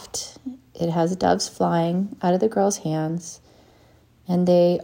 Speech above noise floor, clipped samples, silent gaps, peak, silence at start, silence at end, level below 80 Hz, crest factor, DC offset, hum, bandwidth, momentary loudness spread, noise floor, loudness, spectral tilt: 34 dB; under 0.1%; none; -4 dBFS; 0 s; 0 s; -58 dBFS; 20 dB; under 0.1%; none; 16 kHz; 16 LU; -55 dBFS; -22 LUFS; -6 dB/octave